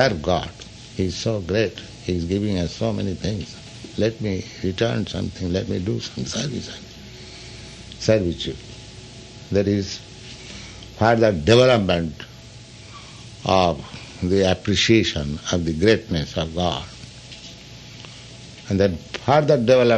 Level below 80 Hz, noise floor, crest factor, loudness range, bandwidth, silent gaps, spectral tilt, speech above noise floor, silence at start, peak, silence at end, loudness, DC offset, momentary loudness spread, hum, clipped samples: -44 dBFS; -41 dBFS; 20 dB; 6 LU; 9.6 kHz; none; -5.5 dB/octave; 21 dB; 0 s; -2 dBFS; 0 s; -21 LUFS; under 0.1%; 22 LU; none; under 0.1%